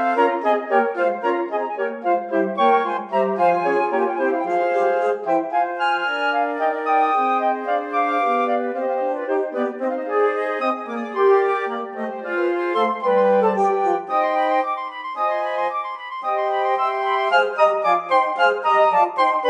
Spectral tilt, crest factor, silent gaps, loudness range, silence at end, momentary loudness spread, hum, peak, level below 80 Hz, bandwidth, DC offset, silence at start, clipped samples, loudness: -5.5 dB/octave; 16 dB; none; 2 LU; 0 s; 7 LU; none; -4 dBFS; under -90 dBFS; 10 kHz; under 0.1%; 0 s; under 0.1%; -20 LUFS